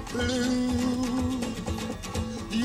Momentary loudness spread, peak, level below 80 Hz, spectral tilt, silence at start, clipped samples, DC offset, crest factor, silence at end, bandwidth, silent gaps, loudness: 7 LU; -16 dBFS; -44 dBFS; -5 dB/octave; 0 s; under 0.1%; under 0.1%; 12 dB; 0 s; 15.5 kHz; none; -29 LUFS